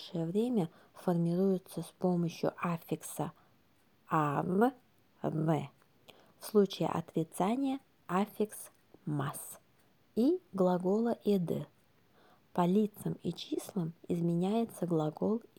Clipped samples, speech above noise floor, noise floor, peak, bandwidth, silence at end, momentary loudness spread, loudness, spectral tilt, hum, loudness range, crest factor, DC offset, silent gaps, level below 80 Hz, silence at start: under 0.1%; 37 dB; -70 dBFS; -16 dBFS; 20 kHz; 0.2 s; 10 LU; -34 LUFS; -7 dB/octave; none; 2 LU; 18 dB; under 0.1%; none; -76 dBFS; 0 s